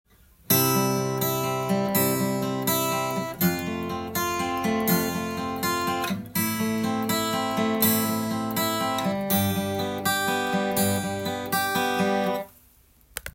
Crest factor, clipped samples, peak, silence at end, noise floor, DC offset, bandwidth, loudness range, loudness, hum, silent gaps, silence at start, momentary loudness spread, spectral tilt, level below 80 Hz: 20 dB; under 0.1%; -6 dBFS; 0.05 s; -57 dBFS; under 0.1%; 17 kHz; 2 LU; -25 LUFS; none; none; 0.5 s; 7 LU; -4 dB/octave; -58 dBFS